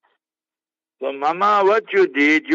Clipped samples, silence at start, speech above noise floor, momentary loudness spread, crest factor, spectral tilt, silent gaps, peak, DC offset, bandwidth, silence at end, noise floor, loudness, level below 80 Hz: under 0.1%; 1 s; over 73 dB; 11 LU; 14 dB; -1.5 dB/octave; none; -4 dBFS; under 0.1%; 7.6 kHz; 0 s; under -90 dBFS; -17 LUFS; -76 dBFS